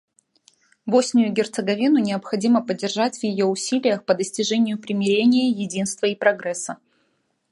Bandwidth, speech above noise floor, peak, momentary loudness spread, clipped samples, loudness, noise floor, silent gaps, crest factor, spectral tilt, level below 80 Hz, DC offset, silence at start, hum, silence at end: 11.5 kHz; 48 dB; -2 dBFS; 7 LU; under 0.1%; -21 LUFS; -69 dBFS; none; 18 dB; -4.5 dB/octave; -70 dBFS; under 0.1%; 0.85 s; none; 0.75 s